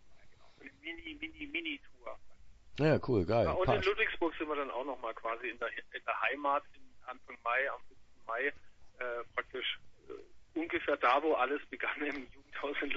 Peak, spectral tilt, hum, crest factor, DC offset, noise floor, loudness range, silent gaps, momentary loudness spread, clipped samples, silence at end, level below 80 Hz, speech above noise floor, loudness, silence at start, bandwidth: -14 dBFS; -3.5 dB/octave; none; 22 dB; under 0.1%; -55 dBFS; 5 LU; none; 20 LU; under 0.1%; 0 s; -58 dBFS; 20 dB; -35 LUFS; 0 s; 7.6 kHz